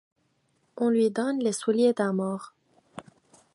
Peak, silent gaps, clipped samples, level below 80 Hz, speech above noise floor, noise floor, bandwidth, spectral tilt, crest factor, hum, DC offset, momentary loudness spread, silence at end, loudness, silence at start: -12 dBFS; none; under 0.1%; -78 dBFS; 46 dB; -71 dBFS; 11.5 kHz; -5.5 dB/octave; 16 dB; none; under 0.1%; 23 LU; 0.55 s; -26 LUFS; 0.75 s